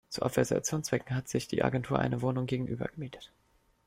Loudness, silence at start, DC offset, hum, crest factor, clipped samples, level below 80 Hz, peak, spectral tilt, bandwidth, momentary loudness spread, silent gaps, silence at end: -32 LUFS; 0.1 s; under 0.1%; none; 20 dB; under 0.1%; -58 dBFS; -12 dBFS; -5.5 dB/octave; 16 kHz; 9 LU; none; 0.6 s